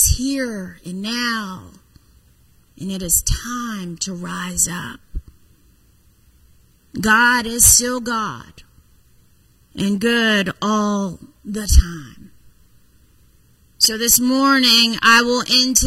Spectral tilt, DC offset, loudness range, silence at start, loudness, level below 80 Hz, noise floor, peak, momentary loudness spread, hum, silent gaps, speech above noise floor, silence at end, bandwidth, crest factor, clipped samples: -2 dB/octave; under 0.1%; 8 LU; 0 s; -16 LUFS; -28 dBFS; -54 dBFS; 0 dBFS; 21 LU; none; none; 36 dB; 0 s; 16 kHz; 20 dB; under 0.1%